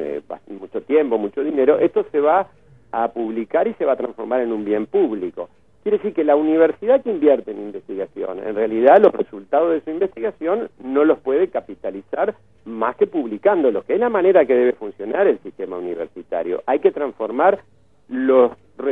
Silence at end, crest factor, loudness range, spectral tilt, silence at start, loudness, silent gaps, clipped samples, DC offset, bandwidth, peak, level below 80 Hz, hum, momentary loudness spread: 0 s; 18 dB; 4 LU; -8.5 dB/octave; 0 s; -19 LUFS; none; under 0.1%; 0.2%; 3.9 kHz; 0 dBFS; -62 dBFS; none; 14 LU